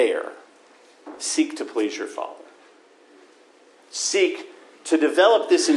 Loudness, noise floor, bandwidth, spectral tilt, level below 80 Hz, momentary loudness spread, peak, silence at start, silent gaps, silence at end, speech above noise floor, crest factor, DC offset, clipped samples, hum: -22 LUFS; -53 dBFS; 12 kHz; -0.5 dB/octave; -86 dBFS; 19 LU; -6 dBFS; 0 s; none; 0 s; 33 dB; 18 dB; under 0.1%; under 0.1%; none